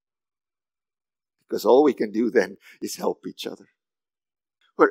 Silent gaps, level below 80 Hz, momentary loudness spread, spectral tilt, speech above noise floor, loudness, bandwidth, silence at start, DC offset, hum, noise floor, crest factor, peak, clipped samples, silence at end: none; -86 dBFS; 18 LU; -4.5 dB/octave; over 67 dB; -23 LUFS; 16 kHz; 1.5 s; under 0.1%; none; under -90 dBFS; 24 dB; -2 dBFS; under 0.1%; 0 s